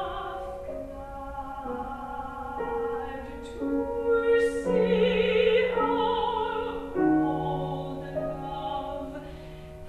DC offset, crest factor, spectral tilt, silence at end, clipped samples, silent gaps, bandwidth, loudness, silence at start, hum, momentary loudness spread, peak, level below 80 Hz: under 0.1%; 16 dB; -6.5 dB/octave; 0 s; under 0.1%; none; 12.5 kHz; -28 LUFS; 0 s; none; 15 LU; -12 dBFS; -46 dBFS